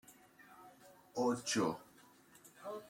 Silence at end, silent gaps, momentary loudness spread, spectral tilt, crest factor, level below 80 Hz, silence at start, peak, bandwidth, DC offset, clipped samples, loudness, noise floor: 0 s; none; 25 LU; -4 dB/octave; 18 dB; -80 dBFS; 0.1 s; -24 dBFS; 16.5 kHz; under 0.1%; under 0.1%; -38 LUFS; -64 dBFS